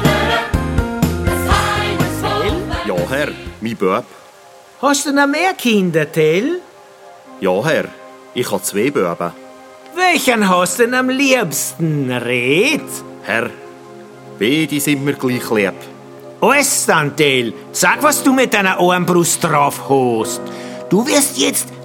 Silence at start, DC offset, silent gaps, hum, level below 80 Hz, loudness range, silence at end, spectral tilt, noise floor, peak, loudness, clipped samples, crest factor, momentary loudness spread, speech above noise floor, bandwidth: 0 s; under 0.1%; none; none; -34 dBFS; 5 LU; 0 s; -4 dB/octave; -42 dBFS; 0 dBFS; -15 LUFS; under 0.1%; 16 dB; 11 LU; 27 dB; 19 kHz